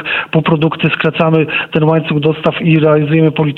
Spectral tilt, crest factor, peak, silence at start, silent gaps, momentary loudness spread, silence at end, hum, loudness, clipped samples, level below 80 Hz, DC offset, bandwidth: -9 dB/octave; 12 dB; 0 dBFS; 0 s; none; 4 LU; 0 s; none; -12 LUFS; under 0.1%; -48 dBFS; under 0.1%; 4.3 kHz